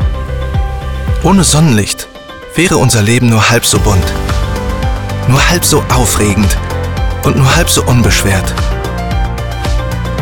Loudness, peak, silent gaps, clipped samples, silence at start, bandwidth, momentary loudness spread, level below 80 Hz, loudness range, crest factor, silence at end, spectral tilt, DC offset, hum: -11 LUFS; 0 dBFS; none; under 0.1%; 0 s; 19 kHz; 9 LU; -18 dBFS; 2 LU; 10 dB; 0 s; -4.5 dB/octave; under 0.1%; none